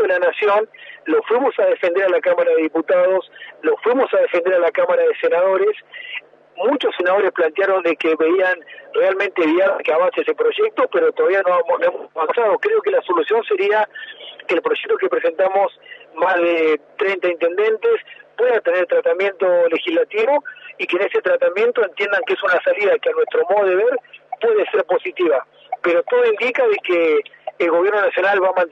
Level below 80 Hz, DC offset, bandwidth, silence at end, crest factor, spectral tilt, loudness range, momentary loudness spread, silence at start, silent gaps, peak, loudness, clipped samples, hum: -82 dBFS; under 0.1%; 6 kHz; 0.05 s; 12 dB; -5 dB/octave; 2 LU; 6 LU; 0 s; none; -6 dBFS; -17 LUFS; under 0.1%; none